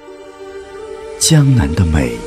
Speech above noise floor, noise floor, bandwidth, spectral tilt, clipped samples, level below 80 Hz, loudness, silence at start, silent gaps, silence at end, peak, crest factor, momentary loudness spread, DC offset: 22 dB; -33 dBFS; 15.5 kHz; -5 dB/octave; under 0.1%; -26 dBFS; -12 LUFS; 0.05 s; none; 0 s; 0 dBFS; 14 dB; 22 LU; under 0.1%